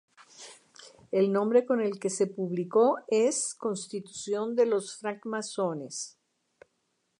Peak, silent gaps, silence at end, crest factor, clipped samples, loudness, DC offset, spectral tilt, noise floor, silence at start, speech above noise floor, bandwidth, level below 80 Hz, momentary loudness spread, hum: -10 dBFS; none; 1.1 s; 18 dB; under 0.1%; -29 LUFS; under 0.1%; -4.5 dB/octave; -77 dBFS; 0.4 s; 49 dB; 11 kHz; -84 dBFS; 13 LU; none